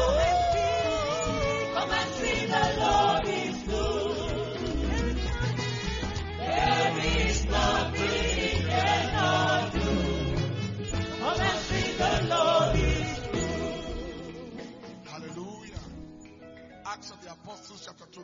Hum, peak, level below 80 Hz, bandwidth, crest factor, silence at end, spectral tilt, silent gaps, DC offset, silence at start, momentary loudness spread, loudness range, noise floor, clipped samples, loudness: none; -12 dBFS; -38 dBFS; 7.6 kHz; 16 dB; 0 s; -4.5 dB/octave; none; under 0.1%; 0 s; 19 LU; 15 LU; -48 dBFS; under 0.1%; -27 LUFS